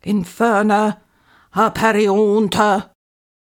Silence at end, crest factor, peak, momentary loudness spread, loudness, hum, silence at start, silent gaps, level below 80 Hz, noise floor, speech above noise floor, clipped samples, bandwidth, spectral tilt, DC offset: 0.7 s; 16 dB; -2 dBFS; 7 LU; -16 LUFS; none; 0.05 s; none; -52 dBFS; -54 dBFS; 39 dB; under 0.1%; 18 kHz; -5.5 dB/octave; under 0.1%